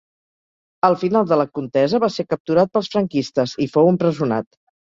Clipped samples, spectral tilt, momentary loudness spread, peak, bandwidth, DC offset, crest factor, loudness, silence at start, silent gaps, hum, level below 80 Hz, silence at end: under 0.1%; -7 dB/octave; 6 LU; -2 dBFS; 7.6 kHz; under 0.1%; 18 dB; -19 LUFS; 0.85 s; 2.40-2.45 s; none; -60 dBFS; 0.5 s